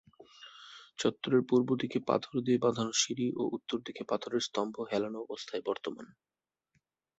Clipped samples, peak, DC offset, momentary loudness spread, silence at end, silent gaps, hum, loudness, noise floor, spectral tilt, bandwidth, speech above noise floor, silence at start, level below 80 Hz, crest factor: under 0.1%; -14 dBFS; under 0.1%; 19 LU; 1.15 s; none; none; -33 LUFS; -78 dBFS; -4 dB/octave; 8.2 kHz; 46 dB; 0.2 s; -74 dBFS; 20 dB